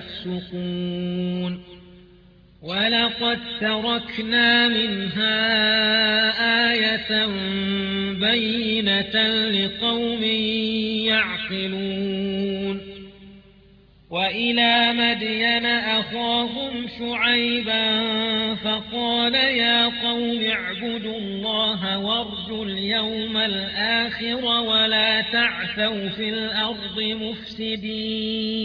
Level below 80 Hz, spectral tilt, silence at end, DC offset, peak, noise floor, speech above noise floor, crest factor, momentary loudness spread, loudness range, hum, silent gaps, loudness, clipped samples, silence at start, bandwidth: -54 dBFS; -6 dB/octave; 0 s; under 0.1%; -6 dBFS; -52 dBFS; 29 dB; 16 dB; 11 LU; 5 LU; none; none; -21 LUFS; under 0.1%; 0 s; 5.4 kHz